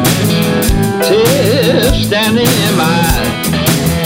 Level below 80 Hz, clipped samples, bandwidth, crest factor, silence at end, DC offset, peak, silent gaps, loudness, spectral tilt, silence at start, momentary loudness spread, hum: -22 dBFS; under 0.1%; 16.5 kHz; 10 dB; 0 s; 0.1%; 0 dBFS; none; -11 LUFS; -4.5 dB/octave; 0 s; 3 LU; none